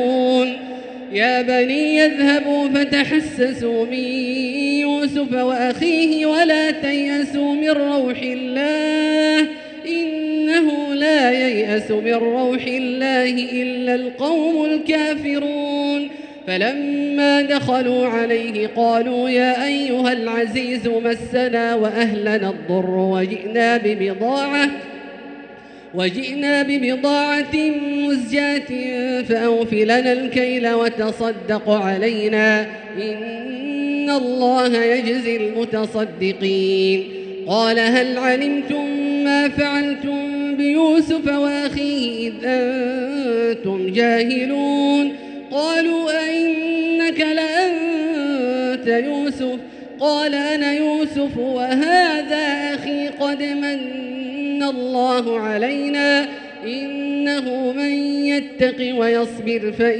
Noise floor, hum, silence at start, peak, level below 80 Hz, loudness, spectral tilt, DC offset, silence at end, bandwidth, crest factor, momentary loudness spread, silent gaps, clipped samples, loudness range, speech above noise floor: -39 dBFS; none; 0 s; -2 dBFS; -58 dBFS; -19 LUFS; -5 dB/octave; under 0.1%; 0 s; 9.6 kHz; 16 dB; 7 LU; none; under 0.1%; 3 LU; 21 dB